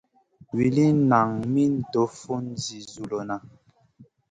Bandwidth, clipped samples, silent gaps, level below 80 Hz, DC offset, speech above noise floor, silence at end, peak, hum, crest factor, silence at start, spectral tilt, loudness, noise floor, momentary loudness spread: 9.4 kHz; under 0.1%; none; -60 dBFS; under 0.1%; 32 dB; 0.25 s; -6 dBFS; none; 20 dB; 0.55 s; -7 dB/octave; -24 LUFS; -55 dBFS; 14 LU